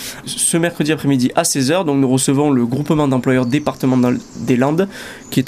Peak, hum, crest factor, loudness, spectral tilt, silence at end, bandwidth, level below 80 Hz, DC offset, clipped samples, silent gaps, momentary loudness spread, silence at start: -2 dBFS; none; 14 dB; -16 LUFS; -5 dB/octave; 0 s; 15.5 kHz; -48 dBFS; under 0.1%; under 0.1%; none; 5 LU; 0 s